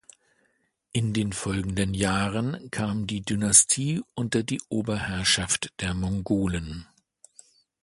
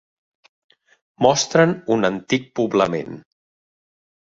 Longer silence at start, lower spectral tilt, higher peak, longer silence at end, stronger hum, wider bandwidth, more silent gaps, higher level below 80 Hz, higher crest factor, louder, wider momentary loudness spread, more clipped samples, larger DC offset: second, 0.95 s vs 1.2 s; about the same, -3.5 dB/octave vs -4.5 dB/octave; about the same, -2 dBFS vs 0 dBFS; about the same, 1 s vs 1.05 s; neither; first, 11.5 kHz vs 8 kHz; neither; first, -46 dBFS vs -58 dBFS; about the same, 26 dB vs 22 dB; second, -25 LUFS vs -19 LUFS; about the same, 12 LU vs 11 LU; neither; neither